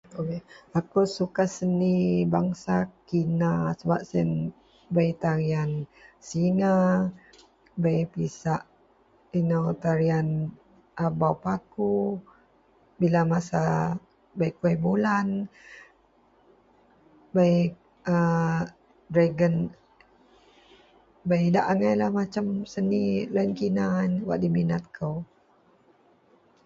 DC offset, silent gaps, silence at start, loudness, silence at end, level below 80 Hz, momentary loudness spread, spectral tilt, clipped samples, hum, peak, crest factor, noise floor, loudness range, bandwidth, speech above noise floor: under 0.1%; none; 0.1 s; -26 LUFS; 1.4 s; -58 dBFS; 10 LU; -8 dB/octave; under 0.1%; none; -8 dBFS; 18 dB; -62 dBFS; 3 LU; 7.8 kHz; 37 dB